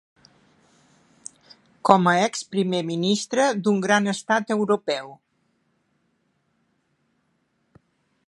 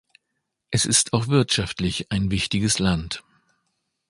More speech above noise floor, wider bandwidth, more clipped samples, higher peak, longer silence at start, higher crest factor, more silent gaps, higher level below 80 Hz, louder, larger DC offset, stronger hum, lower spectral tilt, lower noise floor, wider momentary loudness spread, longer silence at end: second, 49 dB vs 56 dB; about the same, 11.5 kHz vs 11.5 kHz; neither; about the same, 0 dBFS vs -2 dBFS; first, 1.85 s vs 0.7 s; about the same, 24 dB vs 22 dB; neither; second, -70 dBFS vs -42 dBFS; about the same, -22 LUFS vs -22 LUFS; neither; neither; about the same, -4.5 dB/octave vs -3.5 dB/octave; second, -70 dBFS vs -78 dBFS; first, 24 LU vs 9 LU; first, 3.15 s vs 0.9 s